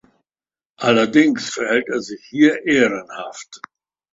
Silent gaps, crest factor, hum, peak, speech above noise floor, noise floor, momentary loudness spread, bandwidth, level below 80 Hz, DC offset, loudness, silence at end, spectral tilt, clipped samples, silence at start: none; 18 dB; none; 0 dBFS; over 72 dB; under -90 dBFS; 18 LU; 7.8 kHz; -62 dBFS; under 0.1%; -17 LUFS; 0.55 s; -4.5 dB/octave; under 0.1%; 0.8 s